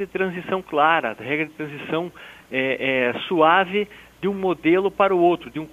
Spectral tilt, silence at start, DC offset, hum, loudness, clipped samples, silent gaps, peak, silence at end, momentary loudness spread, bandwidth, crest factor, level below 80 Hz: -6.5 dB/octave; 0 s; under 0.1%; none; -21 LUFS; under 0.1%; none; -4 dBFS; 0.05 s; 11 LU; 14.5 kHz; 18 dB; -58 dBFS